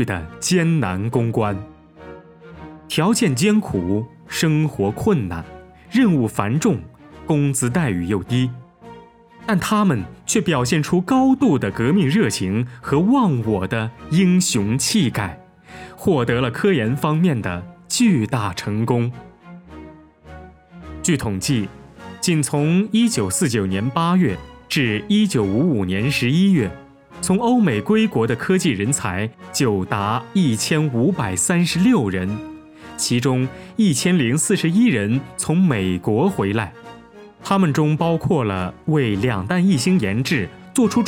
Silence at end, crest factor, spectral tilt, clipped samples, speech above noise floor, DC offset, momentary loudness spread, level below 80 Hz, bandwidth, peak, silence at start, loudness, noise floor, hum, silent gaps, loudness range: 0 s; 20 dB; -5.5 dB/octave; under 0.1%; 26 dB; under 0.1%; 9 LU; -50 dBFS; 17.5 kHz; 0 dBFS; 0 s; -19 LUFS; -44 dBFS; none; none; 3 LU